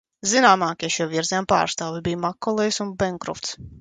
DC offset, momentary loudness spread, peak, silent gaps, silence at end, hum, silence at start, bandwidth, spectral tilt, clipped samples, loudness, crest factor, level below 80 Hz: under 0.1%; 12 LU; -2 dBFS; none; 0 s; none; 0.25 s; 9.6 kHz; -3 dB/octave; under 0.1%; -22 LUFS; 20 dB; -52 dBFS